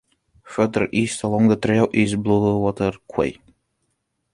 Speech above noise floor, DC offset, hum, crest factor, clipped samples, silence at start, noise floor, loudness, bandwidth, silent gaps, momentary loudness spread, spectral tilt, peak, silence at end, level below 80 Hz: 53 dB; under 0.1%; none; 18 dB; under 0.1%; 0.45 s; -73 dBFS; -20 LUFS; 11.5 kHz; none; 7 LU; -6.5 dB/octave; -2 dBFS; 1 s; -48 dBFS